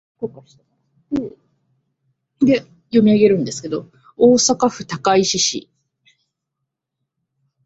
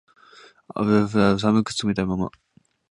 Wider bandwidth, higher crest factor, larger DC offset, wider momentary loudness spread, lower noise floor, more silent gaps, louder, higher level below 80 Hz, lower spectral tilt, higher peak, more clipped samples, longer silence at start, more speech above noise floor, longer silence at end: second, 8 kHz vs 11 kHz; about the same, 18 dB vs 18 dB; neither; first, 17 LU vs 10 LU; first, -79 dBFS vs -51 dBFS; neither; first, -17 LUFS vs -22 LUFS; second, -58 dBFS vs -50 dBFS; second, -4 dB/octave vs -6 dB/octave; about the same, -2 dBFS vs -4 dBFS; neither; second, 0.2 s vs 0.7 s; first, 63 dB vs 30 dB; first, 2.05 s vs 0.6 s